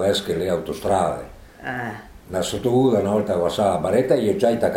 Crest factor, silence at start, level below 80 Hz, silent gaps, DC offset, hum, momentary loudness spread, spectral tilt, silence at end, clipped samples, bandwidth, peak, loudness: 16 dB; 0 s; -48 dBFS; none; under 0.1%; none; 13 LU; -5.5 dB/octave; 0 s; under 0.1%; 16.5 kHz; -6 dBFS; -21 LUFS